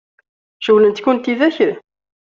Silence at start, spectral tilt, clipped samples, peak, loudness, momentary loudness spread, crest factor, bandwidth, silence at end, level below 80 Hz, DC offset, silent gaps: 0.6 s; -6 dB/octave; under 0.1%; -2 dBFS; -15 LUFS; 10 LU; 14 dB; 7 kHz; 0.5 s; -62 dBFS; under 0.1%; none